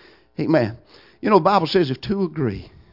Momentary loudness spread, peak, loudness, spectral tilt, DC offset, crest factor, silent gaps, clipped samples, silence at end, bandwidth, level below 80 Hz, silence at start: 12 LU; -2 dBFS; -20 LUFS; -8 dB/octave; under 0.1%; 20 dB; none; under 0.1%; 0.25 s; 5.8 kHz; -50 dBFS; 0.4 s